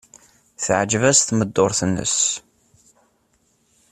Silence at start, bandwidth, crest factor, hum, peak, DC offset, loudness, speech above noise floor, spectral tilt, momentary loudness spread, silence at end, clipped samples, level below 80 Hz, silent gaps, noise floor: 0.6 s; 14 kHz; 20 dB; none; -2 dBFS; under 0.1%; -18 LUFS; 45 dB; -3 dB/octave; 7 LU; 1.55 s; under 0.1%; -54 dBFS; none; -64 dBFS